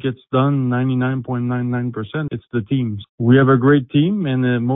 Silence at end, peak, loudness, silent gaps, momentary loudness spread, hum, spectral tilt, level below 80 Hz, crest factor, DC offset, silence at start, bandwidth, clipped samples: 0 s; -2 dBFS; -18 LUFS; 3.09-3.18 s; 11 LU; none; -13 dB/octave; -52 dBFS; 14 dB; under 0.1%; 0.05 s; 3.9 kHz; under 0.1%